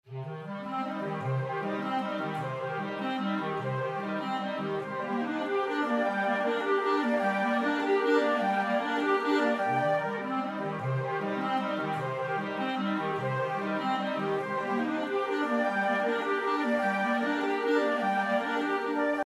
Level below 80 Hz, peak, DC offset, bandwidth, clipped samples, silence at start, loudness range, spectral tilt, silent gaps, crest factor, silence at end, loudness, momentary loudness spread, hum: -80 dBFS; -14 dBFS; under 0.1%; 13 kHz; under 0.1%; 0.05 s; 5 LU; -6.5 dB/octave; none; 16 dB; 0.05 s; -30 LUFS; 6 LU; none